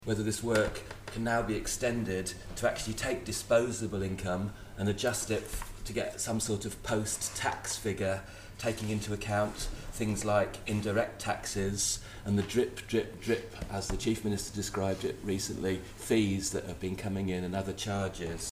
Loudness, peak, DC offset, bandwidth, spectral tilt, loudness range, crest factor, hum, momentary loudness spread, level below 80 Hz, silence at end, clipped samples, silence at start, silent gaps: -33 LUFS; -14 dBFS; under 0.1%; 15.5 kHz; -4.5 dB/octave; 2 LU; 18 dB; none; 7 LU; -48 dBFS; 0 s; under 0.1%; 0 s; none